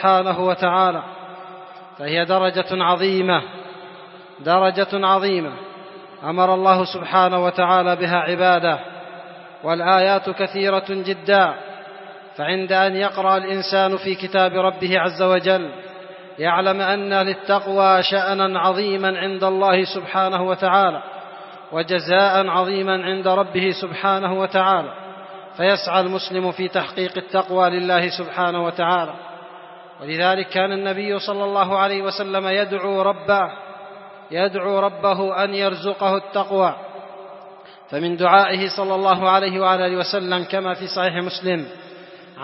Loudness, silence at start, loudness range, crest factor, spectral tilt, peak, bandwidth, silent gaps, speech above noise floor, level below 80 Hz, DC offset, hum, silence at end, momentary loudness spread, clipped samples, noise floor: -19 LUFS; 0 s; 3 LU; 20 dB; -8 dB/octave; 0 dBFS; 6 kHz; none; 23 dB; -72 dBFS; under 0.1%; none; 0 s; 20 LU; under 0.1%; -42 dBFS